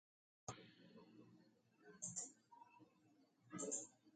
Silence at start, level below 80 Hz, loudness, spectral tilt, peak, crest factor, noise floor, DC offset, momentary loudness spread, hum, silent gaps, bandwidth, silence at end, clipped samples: 0.45 s; -90 dBFS; -51 LUFS; -3 dB/octave; -34 dBFS; 24 dB; -76 dBFS; under 0.1%; 21 LU; none; none; 9 kHz; 0 s; under 0.1%